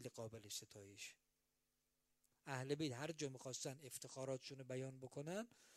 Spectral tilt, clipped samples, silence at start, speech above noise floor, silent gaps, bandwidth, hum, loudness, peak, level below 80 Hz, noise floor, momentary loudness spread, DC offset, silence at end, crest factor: -4 dB/octave; under 0.1%; 0 s; 37 dB; none; 15.5 kHz; none; -50 LUFS; -30 dBFS; -88 dBFS; -87 dBFS; 10 LU; under 0.1%; 0 s; 22 dB